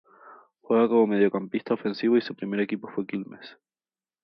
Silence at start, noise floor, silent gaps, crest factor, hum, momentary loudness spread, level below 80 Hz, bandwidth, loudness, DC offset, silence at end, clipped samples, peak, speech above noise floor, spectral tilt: 0.25 s; under -90 dBFS; none; 18 dB; none; 13 LU; -76 dBFS; 5.8 kHz; -25 LUFS; under 0.1%; 0.75 s; under 0.1%; -10 dBFS; over 65 dB; -9 dB/octave